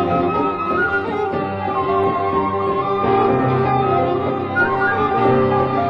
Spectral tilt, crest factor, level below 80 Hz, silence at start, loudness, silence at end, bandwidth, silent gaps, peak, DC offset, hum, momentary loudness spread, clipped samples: -9 dB/octave; 14 dB; -42 dBFS; 0 s; -18 LUFS; 0 s; 5.8 kHz; none; -4 dBFS; under 0.1%; none; 5 LU; under 0.1%